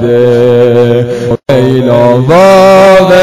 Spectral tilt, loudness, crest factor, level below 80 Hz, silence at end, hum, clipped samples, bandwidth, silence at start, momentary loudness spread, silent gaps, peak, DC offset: -6.5 dB/octave; -5 LUFS; 4 dB; -36 dBFS; 0 s; none; 8%; 15 kHz; 0 s; 7 LU; none; 0 dBFS; under 0.1%